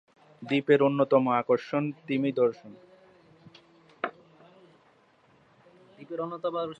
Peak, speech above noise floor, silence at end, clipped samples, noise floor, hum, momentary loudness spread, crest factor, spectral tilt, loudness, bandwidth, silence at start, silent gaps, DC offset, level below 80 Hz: -8 dBFS; 36 dB; 0.05 s; under 0.1%; -63 dBFS; none; 14 LU; 22 dB; -8 dB/octave; -27 LUFS; 7.8 kHz; 0.4 s; none; under 0.1%; -78 dBFS